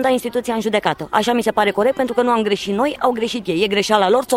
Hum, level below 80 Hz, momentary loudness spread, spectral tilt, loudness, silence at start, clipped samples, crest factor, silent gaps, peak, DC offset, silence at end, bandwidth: none; -52 dBFS; 5 LU; -4 dB/octave; -18 LUFS; 0 s; under 0.1%; 16 dB; none; 0 dBFS; under 0.1%; 0 s; 16.5 kHz